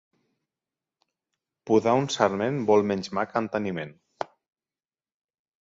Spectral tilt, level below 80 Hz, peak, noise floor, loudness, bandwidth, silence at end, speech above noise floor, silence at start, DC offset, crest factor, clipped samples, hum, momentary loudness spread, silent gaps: -5.5 dB/octave; -66 dBFS; -6 dBFS; under -90 dBFS; -25 LUFS; 7.8 kHz; 1.35 s; over 66 dB; 1.65 s; under 0.1%; 22 dB; under 0.1%; none; 16 LU; none